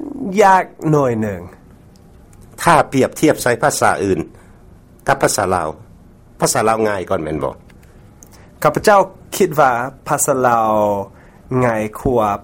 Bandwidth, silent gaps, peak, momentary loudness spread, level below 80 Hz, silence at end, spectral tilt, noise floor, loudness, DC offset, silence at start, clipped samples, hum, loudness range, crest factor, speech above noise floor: 16.5 kHz; none; 0 dBFS; 10 LU; -44 dBFS; 0 s; -4.5 dB/octave; -43 dBFS; -16 LUFS; under 0.1%; 0 s; under 0.1%; none; 3 LU; 16 dB; 28 dB